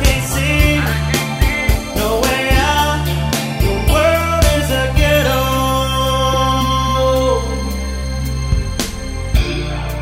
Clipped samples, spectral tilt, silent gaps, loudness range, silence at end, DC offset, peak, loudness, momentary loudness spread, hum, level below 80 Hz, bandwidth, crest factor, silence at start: under 0.1%; -4.5 dB/octave; none; 3 LU; 0 s; under 0.1%; 0 dBFS; -16 LUFS; 8 LU; none; -20 dBFS; 16.5 kHz; 14 dB; 0 s